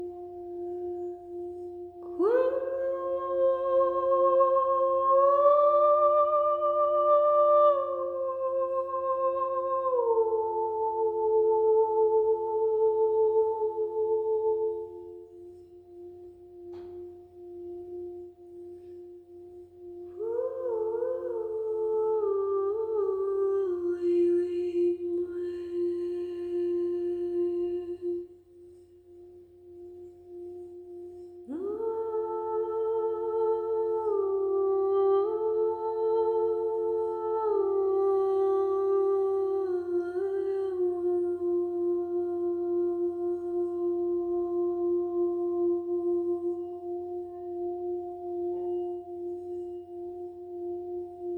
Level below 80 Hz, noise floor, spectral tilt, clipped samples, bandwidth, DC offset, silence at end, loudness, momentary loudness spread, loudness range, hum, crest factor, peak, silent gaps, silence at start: -68 dBFS; -53 dBFS; -8.5 dB/octave; under 0.1%; 4.4 kHz; under 0.1%; 0 s; -28 LUFS; 20 LU; 15 LU; none; 16 dB; -12 dBFS; none; 0 s